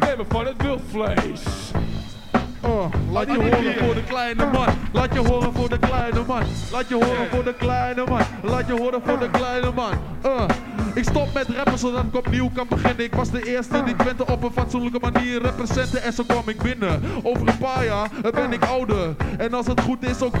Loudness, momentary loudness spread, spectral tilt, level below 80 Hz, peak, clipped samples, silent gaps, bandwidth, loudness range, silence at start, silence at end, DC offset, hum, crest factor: -22 LUFS; 4 LU; -6.5 dB/octave; -32 dBFS; -4 dBFS; under 0.1%; none; 15 kHz; 2 LU; 0 s; 0 s; under 0.1%; none; 18 dB